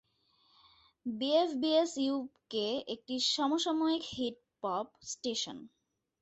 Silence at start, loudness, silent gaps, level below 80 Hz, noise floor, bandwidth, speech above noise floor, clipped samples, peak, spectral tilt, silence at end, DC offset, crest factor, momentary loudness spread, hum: 1.05 s; -33 LUFS; none; -74 dBFS; -72 dBFS; 8.4 kHz; 39 dB; under 0.1%; -16 dBFS; -3 dB/octave; 0.55 s; under 0.1%; 18 dB; 11 LU; none